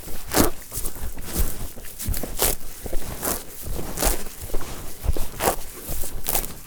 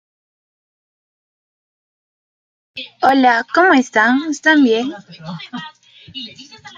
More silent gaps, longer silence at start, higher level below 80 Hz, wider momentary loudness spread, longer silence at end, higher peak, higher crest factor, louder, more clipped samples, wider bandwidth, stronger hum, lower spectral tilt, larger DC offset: neither; second, 0 s vs 2.75 s; first, -30 dBFS vs -66 dBFS; second, 11 LU vs 21 LU; about the same, 0 s vs 0.1 s; about the same, 0 dBFS vs -2 dBFS; first, 24 dB vs 16 dB; second, -27 LUFS vs -13 LUFS; neither; first, over 20 kHz vs 7.6 kHz; neither; about the same, -3.5 dB/octave vs -4 dB/octave; neither